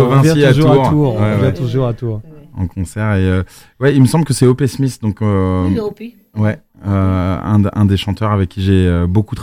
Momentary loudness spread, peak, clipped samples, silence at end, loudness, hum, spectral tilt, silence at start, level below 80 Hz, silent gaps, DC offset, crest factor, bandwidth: 13 LU; 0 dBFS; under 0.1%; 0 s; -14 LUFS; none; -7 dB/octave; 0 s; -36 dBFS; none; under 0.1%; 14 dB; 15 kHz